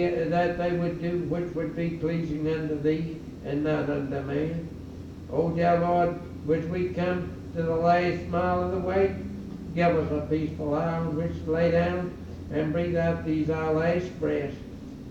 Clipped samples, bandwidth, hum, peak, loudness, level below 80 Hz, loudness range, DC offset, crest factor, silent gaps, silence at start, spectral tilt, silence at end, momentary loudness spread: under 0.1%; 7.8 kHz; none; -10 dBFS; -27 LUFS; -50 dBFS; 3 LU; under 0.1%; 16 dB; none; 0 s; -8.5 dB/octave; 0 s; 12 LU